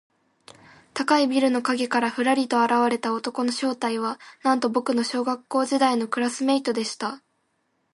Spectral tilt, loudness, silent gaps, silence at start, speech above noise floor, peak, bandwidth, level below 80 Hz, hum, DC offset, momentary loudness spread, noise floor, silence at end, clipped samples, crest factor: -3.5 dB/octave; -23 LUFS; none; 0.95 s; 48 dB; -6 dBFS; 11.5 kHz; -76 dBFS; none; under 0.1%; 8 LU; -71 dBFS; 0.75 s; under 0.1%; 18 dB